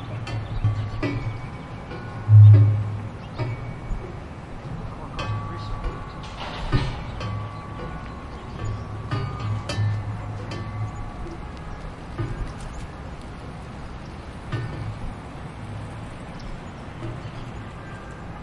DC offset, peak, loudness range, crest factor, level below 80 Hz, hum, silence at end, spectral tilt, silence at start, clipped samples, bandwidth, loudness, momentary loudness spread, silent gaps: under 0.1%; -4 dBFS; 15 LU; 20 dB; -38 dBFS; none; 0 s; -7.5 dB/octave; 0 s; under 0.1%; 7.4 kHz; -25 LUFS; 11 LU; none